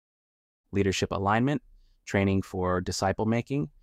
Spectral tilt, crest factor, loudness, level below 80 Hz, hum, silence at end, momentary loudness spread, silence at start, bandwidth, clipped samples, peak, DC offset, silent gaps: -5.5 dB/octave; 18 dB; -28 LUFS; -54 dBFS; none; 0.15 s; 7 LU; 0.7 s; 14.5 kHz; under 0.1%; -12 dBFS; under 0.1%; none